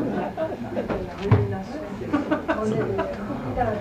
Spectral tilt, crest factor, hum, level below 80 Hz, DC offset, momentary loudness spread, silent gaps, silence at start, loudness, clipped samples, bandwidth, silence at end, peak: -8 dB/octave; 20 dB; none; -44 dBFS; under 0.1%; 8 LU; none; 0 s; -26 LUFS; under 0.1%; 9.4 kHz; 0 s; -4 dBFS